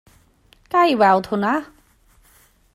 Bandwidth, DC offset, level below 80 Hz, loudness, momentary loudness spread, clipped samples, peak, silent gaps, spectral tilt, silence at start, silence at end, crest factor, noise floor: 15 kHz; under 0.1%; -58 dBFS; -18 LUFS; 8 LU; under 0.1%; -4 dBFS; none; -6 dB/octave; 0.75 s; 1.1 s; 18 dB; -55 dBFS